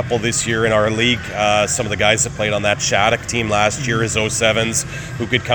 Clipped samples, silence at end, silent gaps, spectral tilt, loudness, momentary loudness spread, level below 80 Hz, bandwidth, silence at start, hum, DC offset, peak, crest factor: under 0.1%; 0 s; none; -3 dB/octave; -17 LUFS; 4 LU; -40 dBFS; over 20 kHz; 0 s; none; under 0.1%; 0 dBFS; 18 dB